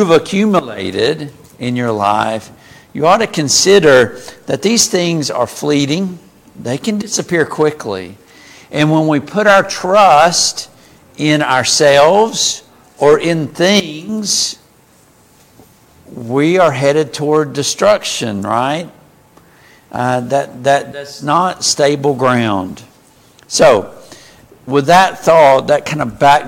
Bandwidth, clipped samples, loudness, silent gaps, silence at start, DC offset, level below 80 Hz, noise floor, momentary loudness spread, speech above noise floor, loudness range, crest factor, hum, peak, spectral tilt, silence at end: 17 kHz; under 0.1%; -12 LUFS; none; 0 s; under 0.1%; -50 dBFS; -48 dBFS; 15 LU; 36 dB; 6 LU; 14 dB; none; 0 dBFS; -3.5 dB/octave; 0 s